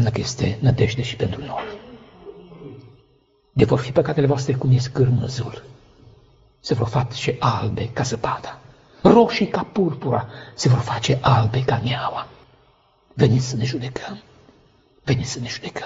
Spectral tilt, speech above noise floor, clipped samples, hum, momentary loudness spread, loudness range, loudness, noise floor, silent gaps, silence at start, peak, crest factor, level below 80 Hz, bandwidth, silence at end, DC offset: -6.5 dB/octave; 39 dB; under 0.1%; none; 20 LU; 6 LU; -21 LUFS; -60 dBFS; none; 0 s; 0 dBFS; 22 dB; -46 dBFS; 8 kHz; 0 s; under 0.1%